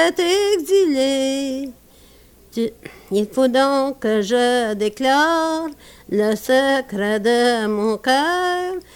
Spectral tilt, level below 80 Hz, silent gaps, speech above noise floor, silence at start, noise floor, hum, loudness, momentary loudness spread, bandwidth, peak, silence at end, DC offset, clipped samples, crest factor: -4 dB/octave; -54 dBFS; none; 30 dB; 0 s; -48 dBFS; 60 Hz at -55 dBFS; -19 LUFS; 9 LU; 19 kHz; -4 dBFS; 0.15 s; under 0.1%; under 0.1%; 14 dB